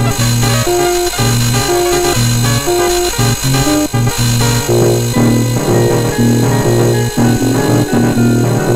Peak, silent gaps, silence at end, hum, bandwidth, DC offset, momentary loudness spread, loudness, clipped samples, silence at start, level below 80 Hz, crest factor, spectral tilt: 0 dBFS; none; 0 s; none; 16 kHz; under 0.1%; 1 LU; -12 LUFS; under 0.1%; 0 s; -28 dBFS; 12 dB; -5 dB/octave